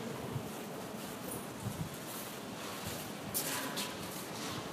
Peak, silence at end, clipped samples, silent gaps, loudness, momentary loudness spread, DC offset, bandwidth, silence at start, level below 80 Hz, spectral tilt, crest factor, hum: -18 dBFS; 0 s; under 0.1%; none; -40 LUFS; 7 LU; under 0.1%; 15.5 kHz; 0 s; -64 dBFS; -3.5 dB/octave; 22 dB; none